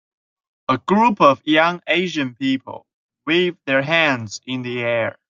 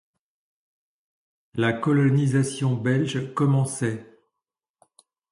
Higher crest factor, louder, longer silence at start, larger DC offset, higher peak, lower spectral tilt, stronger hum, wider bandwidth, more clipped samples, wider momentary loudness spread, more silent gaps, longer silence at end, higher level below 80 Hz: about the same, 18 dB vs 16 dB; first, -18 LUFS vs -23 LUFS; second, 0.7 s vs 1.55 s; neither; first, -2 dBFS vs -8 dBFS; second, -5 dB/octave vs -6.5 dB/octave; neither; second, 7.6 kHz vs 11.5 kHz; neither; first, 13 LU vs 8 LU; first, 2.93-3.09 s vs none; second, 0.15 s vs 1.3 s; about the same, -64 dBFS vs -64 dBFS